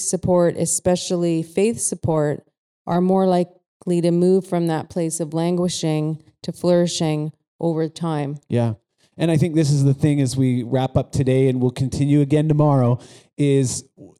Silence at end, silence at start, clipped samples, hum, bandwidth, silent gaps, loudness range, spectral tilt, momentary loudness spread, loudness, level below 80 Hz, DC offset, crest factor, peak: 0.1 s; 0 s; under 0.1%; none; 13 kHz; 2.58-2.85 s, 3.66-3.80 s, 7.48-7.59 s; 3 LU; -6.5 dB/octave; 9 LU; -20 LUFS; -50 dBFS; under 0.1%; 12 dB; -6 dBFS